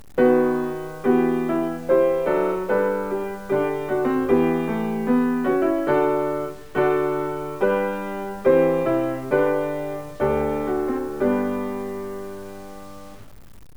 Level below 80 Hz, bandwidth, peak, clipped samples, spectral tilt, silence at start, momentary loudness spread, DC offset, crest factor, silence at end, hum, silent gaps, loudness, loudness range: -50 dBFS; over 20 kHz; -6 dBFS; under 0.1%; -7.5 dB/octave; 0.15 s; 11 LU; 0.8%; 16 dB; 0.4 s; none; none; -22 LUFS; 4 LU